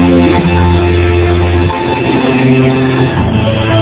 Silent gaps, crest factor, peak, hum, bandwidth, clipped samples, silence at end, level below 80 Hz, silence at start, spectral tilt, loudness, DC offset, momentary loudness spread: none; 8 dB; 0 dBFS; none; 4 kHz; 0.6%; 0 s; -18 dBFS; 0 s; -11.5 dB/octave; -10 LUFS; under 0.1%; 3 LU